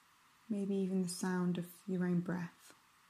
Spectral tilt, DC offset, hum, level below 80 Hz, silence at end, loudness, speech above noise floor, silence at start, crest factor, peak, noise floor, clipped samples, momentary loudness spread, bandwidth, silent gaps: -6.5 dB/octave; under 0.1%; none; -84 dBFS; 0.4 s; -38 LUFS; 28 dB; 0.5 s; 12 dB; -26 dBFS; -65 dBFS; under 0.1%; 7 LU; 14.5 kHz; none